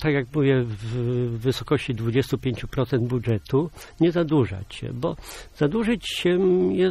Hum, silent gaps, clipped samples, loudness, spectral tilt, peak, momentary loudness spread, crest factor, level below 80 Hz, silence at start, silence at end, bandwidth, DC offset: none; none; under 0.1%; -24 LUFS; -7 dB/octave; -10 dBFS; 9 LU; 14 dB; -46 dBFS; 0 s; 0 s; 15 kHz; under 0.1%